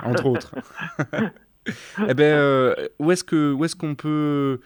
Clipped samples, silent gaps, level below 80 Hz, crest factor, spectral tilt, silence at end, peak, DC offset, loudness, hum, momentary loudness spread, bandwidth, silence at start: under 0.1%; none; -62 dBFS; 16 dB; -6 dB/octave; 0.05 s; -4 dBFS; under 0.1%; -21 LUFS; none; 15 LU; 19.5 kHz; 0 s